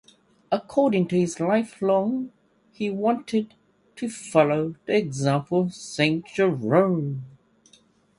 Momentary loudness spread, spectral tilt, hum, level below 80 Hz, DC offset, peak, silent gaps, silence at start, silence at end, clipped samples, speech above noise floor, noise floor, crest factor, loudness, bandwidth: 11 LU; -6 dB/octave; none; -66 dBFS; under 0.1%; -4 dBFS; none; 0.5 s; 0.9 s; under 0.1%; 36 dB; -59 dBFS; 20 dB; -24 LUFS; 11.5 kHz